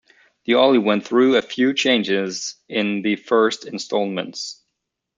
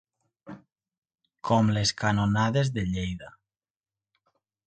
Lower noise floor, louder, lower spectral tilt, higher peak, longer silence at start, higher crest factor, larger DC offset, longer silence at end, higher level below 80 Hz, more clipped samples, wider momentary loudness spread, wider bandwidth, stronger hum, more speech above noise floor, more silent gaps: second, -78 dBFS vs under -90 dBFS; first, -19 LUFS vs -26 LUFS; second, -4 dB/octave vs -5.5 dB/octave; first, -2 dBFS vs -10 dBFS; about the same, 0.5 s vs 0.45 s; about the same, 18 dB vs 20 dB; neither; second, 0.65 s vs 1.35 s; second, -68 dBFS vs -50 dBFS; neither; second, 13 LU vs 21 LU; about the same, 9 kHz vs 9.2 kHz; neither; second, 59 dB vs over 65 dB; second, none vs 0.98-1.02 s